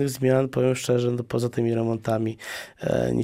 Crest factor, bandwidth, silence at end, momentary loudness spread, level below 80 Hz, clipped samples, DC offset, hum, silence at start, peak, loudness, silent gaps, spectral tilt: 16 dB; 16 kHz; 0 s; 8 LU; -54 dBFS; under 0.1%; under 0.1%; none; 0 s; -8 dBFS; -25 LUFS; none; -6.5 dB/octave